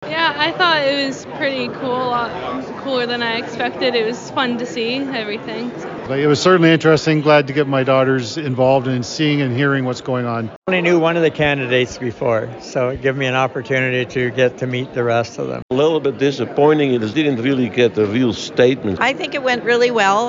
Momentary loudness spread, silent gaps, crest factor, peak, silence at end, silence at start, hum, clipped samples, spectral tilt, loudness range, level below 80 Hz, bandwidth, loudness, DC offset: 9 LU; 10.56-10.62 s, 15.62-15.69 s; 16 dB; -2 dBFS; 0 s; 0 s; none; under 0.1%; -5.5 dB/octave; 5 LU; -52 dBFS; 7.6 kHz; -17 LUFS; under 0.1%